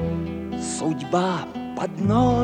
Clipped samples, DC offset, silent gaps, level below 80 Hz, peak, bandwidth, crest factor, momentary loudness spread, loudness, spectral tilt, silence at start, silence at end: under 0.1%; under 0.1%; none; -44 dBFS; -8 dBFS; 10.5 kHz; 16 dB; 9 LU; -25 LUFS; -6 dB/octave; 0 s; 0 s